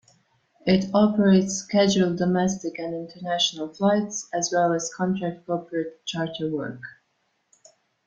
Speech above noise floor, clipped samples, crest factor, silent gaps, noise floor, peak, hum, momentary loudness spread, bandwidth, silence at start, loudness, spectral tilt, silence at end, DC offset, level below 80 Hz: 48 dB; under 0.1%; 18 dB; none; -72 dBFS; -6 dBFS; none; 12 LU; 7.8 kHz; 0.65 s; -24 LUFS; -5 dB/octave; 1.15 s; under 0.1%; -62 dBFS